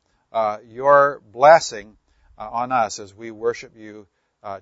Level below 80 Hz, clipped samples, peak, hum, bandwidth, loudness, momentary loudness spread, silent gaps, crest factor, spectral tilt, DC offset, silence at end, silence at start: -60 dBFS; under 0.1%; 0 dBFS; none; 8 kHz; -19 LUFS; 23 LU; none; 20 dB; -3.5 dB/octave; under 0.1%; 0.05 s; 0.35 s